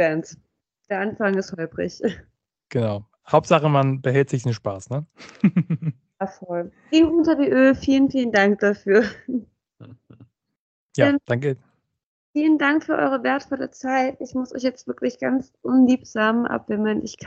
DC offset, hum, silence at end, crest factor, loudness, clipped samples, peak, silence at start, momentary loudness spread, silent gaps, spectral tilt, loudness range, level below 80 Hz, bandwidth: under 0.1%; none; 0 s; 20 dB; -21 LUFS; under 0.1%; -2 dBFS; 0 s; 13 LU; 10.59-10.89 s, 12.03-12.34 s; -7 dB/octave; 5 LU; -56 dBFS; 8.2 kHz